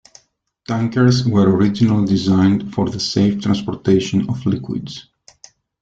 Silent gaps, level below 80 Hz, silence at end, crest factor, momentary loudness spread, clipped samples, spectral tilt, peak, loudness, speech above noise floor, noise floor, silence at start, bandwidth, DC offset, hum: none; -48 dBFS; 0.8 s; 14 dB; 10 LU; under 0.1%; -7 dB/octave; -2 dBFS; -17 LUFS; 43 dB; -59 dBFS; 0.7 s; 7.8 kHz; under 0.1%; none